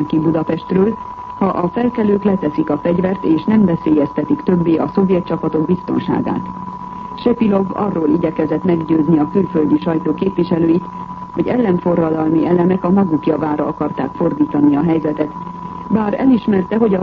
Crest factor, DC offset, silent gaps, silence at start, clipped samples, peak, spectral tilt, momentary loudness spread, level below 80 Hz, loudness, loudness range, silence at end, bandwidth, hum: 12 dB; under 0.1%; none; 0 s; under 0.1%; -2 dBFS; -10.5 dB/octave; 8 LU; -46 dBFS; -16 LUFS; 2 LU; 0 s; 5.4 kHz; none